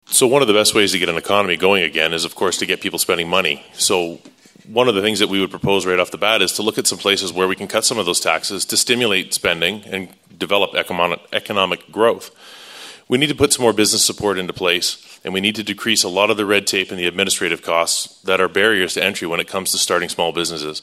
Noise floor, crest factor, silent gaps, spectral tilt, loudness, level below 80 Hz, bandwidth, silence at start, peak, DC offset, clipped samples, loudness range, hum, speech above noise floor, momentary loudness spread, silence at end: -38 dBFS; 18 dB; none; -2 dB/octave; -17 LUFS; -54 dBFS; 16 kHz; 0.1 s; 0 dBFS; under 0.1%; under 0.1%; 2 LU; none; 20 dB; 7 LU; 0 s